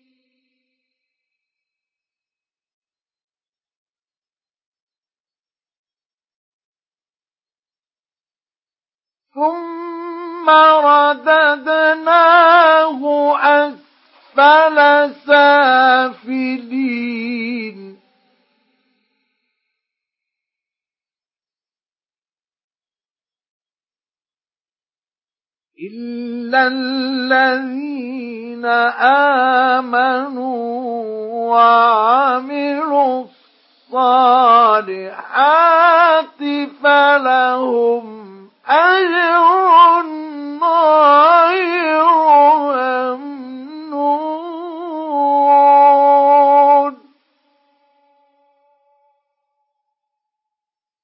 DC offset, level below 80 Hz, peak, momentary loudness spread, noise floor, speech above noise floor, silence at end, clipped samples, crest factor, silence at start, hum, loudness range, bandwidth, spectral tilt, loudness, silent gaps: under 0.1%; -84 dBFS; 0 dBFS; 17 LU; under -90 dBFS; over 78 dB; 4.1 s; under 0.1%; 14 dB; 9.35 s; none; 11 LU; 5.8 kHz; -7.5 dB/octave; -12 LUFS; 22.64-22.70 s, 23.49-23.60 s, 24.61-24.65 s